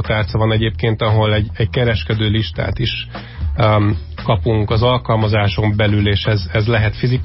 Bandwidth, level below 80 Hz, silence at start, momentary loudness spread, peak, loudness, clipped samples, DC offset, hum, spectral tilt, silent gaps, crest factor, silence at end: 5.8 kHz; -28 dBFS; 0 s; 5 LU; -4 dBFS; -16 LUFS; under 0.1%; under 0.1%; none; -11 dB/octave; none; 12 dB; 0 s